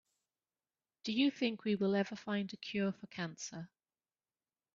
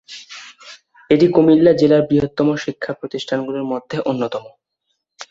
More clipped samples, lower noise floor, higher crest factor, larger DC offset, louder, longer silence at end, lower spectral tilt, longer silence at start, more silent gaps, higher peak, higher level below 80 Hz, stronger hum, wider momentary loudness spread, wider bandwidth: neither; first, under -90 dBFS vs -73 dBFS; about the same, 18 dB vs 16 dB; neither; second, -37 LUFS vs -17 LUFS; first, 1.1 s vs 0.05 s; second, -4.5 dB/octave vs -7 dB/octave; first, 1.05 s vs 0.1 s; neither; second, -20 dBFS vs -2 dBFS; second, -80 dBFS vs -54 dBFS; neither; second, 12 LU vs 21 LU; about the same, 7.6 kHz vs 7.8 kHz